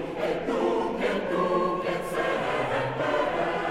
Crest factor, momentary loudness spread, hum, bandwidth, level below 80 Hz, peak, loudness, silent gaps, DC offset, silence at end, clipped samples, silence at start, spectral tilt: 14 dB; 3 LU; none; 15.5 kHz; -50 dBFS; -14 dBFS; -27 LUFS; none; under 0.1%; 0 s; under 0.1%; 0 s; -5.5 dB/octave